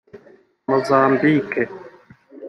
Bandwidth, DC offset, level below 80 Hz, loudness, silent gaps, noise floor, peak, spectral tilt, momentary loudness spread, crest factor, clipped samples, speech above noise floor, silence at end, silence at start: 12 kHz; under 0.1%; -64 dBFS; -18 LUFS; none; -51 dBFS; -2 dBFS; -7.5 dB/octave; 16 LU; 18 dB; under 0.1%; 34 dB; 0 s; 0.15 s